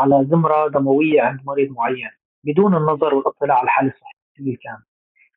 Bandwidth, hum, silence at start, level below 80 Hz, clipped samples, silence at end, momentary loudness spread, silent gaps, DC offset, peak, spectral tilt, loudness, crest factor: 3.9 kHz; none; 0 s; -64 dBFS; under 0.1%; 0.6 s; 14 LU; 2.25-2.42 s, 4.13-4.35 s; under 0.1%; -4 dBFS; -6.5 dB/octave; -18 LUFS; 14 dB